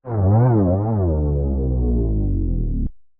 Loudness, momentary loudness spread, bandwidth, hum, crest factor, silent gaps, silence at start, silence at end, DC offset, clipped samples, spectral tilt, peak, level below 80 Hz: -20 LUFS; 8 LU; 2.3 kHz; none; 12 dB; none; 0.05 s; 0.2 s; under 0.1%; under 0.1%; -14.5 dB/octave; -6 dBFS; -24 dBFS